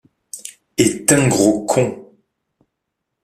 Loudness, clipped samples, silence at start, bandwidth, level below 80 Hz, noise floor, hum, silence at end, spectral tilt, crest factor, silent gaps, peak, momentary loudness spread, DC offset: -16 LUFS; under 0.1%; 0.35 s; 15.5 kHz; -52 dBFS; -77 dBFS; none; 1.2 s; -4.5 dB/octave; 20 dB; none; 0 dBFS; 19 LU; under 0.1%